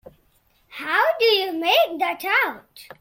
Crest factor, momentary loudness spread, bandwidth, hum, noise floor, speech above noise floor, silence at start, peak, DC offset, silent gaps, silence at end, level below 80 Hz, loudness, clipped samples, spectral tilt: 16 dB; 15 LU; 16.5 kHz; none; -62 dBFS; 41 dB; 0.05 s; -6 dBFS; under 0.1%; none; 0.2 s; -68 dBFS; -20 LUFS; under 0.1%; -1.5 dB/octave